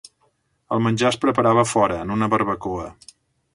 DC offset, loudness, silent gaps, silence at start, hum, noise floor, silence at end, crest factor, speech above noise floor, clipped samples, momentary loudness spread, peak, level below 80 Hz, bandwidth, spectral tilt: under 0.1%; -20 LUFS; none; 0.7 s; none; -66 dBFS; 0.6 s; 18 dB; 46 dB; under 0.1%; 11 LU; -4 dBFS; -50 dBFS; 11.5 kHz; -5.5 dB/octave